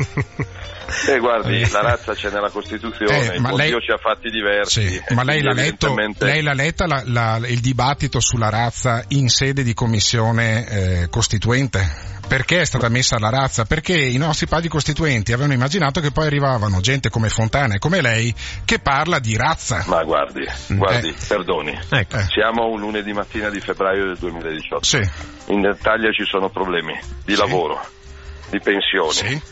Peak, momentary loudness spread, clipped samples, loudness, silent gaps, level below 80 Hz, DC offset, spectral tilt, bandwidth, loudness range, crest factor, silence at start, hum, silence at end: 0 dBFS; 7 LU; under 0.1%; -18 LUFS; none; -36 dBFS; under 0.1%; -4.5 dB/octave; 8.2 kHz; 2 LU; 18 dB; 0 s; none; 0 s